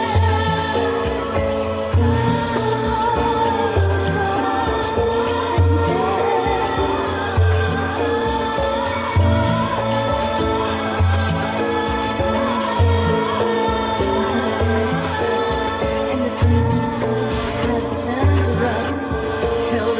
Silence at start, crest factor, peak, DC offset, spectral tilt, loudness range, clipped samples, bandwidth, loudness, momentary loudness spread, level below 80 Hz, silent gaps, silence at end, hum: 0 s; 14 dB; -4 dBFS; under 0.1%; -11 dB/octave; 1 LU; under 0.1%; 4 kHz; -19 LUFS; 4 LU; -28 dBFS; none; 0 s; none